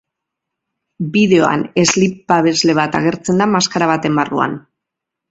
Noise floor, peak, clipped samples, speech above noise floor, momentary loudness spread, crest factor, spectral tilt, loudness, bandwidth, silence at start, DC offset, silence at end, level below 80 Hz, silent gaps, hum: -81 dBFS; 0 dBFS; under 0.1%; 67 dB; 7 LU; 16 dB; -4.5 dB/octave; -14 LUFS; 8.2 kHz; 1 s; under 0.1%; 0.7 s; -54 dBFS; none; none